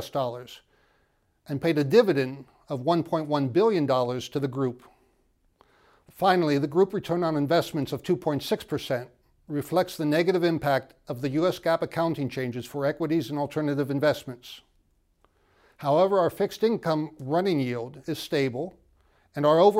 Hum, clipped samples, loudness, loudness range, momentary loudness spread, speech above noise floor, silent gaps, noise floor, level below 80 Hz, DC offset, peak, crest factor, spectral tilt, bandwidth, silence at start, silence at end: none; under 0.1%; -26 LUFS; 3 LU; 12 LU; 43 dB; none; -69 dBFS; -64 dBFS; under 0.1%; -6 dBFS; 20 dB; -6.5 dB/octave; 16 kHz; 0 s; 0 s